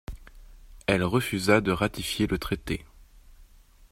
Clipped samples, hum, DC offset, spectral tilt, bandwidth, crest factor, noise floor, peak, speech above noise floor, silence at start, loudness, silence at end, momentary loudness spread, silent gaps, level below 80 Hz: under 0.1%; none; under 0.1%; -5 dB/octave; 16 kHz; 24 dB; -54 dBFS; -4 dBFS; 28 dB; 0.1 s; -27 LUFS; 0.5 s; 12 LU; none; -46 dBFS